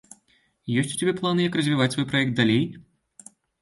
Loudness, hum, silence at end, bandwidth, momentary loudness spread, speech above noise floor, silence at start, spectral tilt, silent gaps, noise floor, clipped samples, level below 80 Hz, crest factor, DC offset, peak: -23 LUFS; none; 0.8 s; 11.5 kHz; 6 LU; 42 dB; 0.65 s; -5 dB/octave; none; -65 dBFS; under 0.1%; -60 dBFS; 18 dB; under 0.1%; -6 dBFS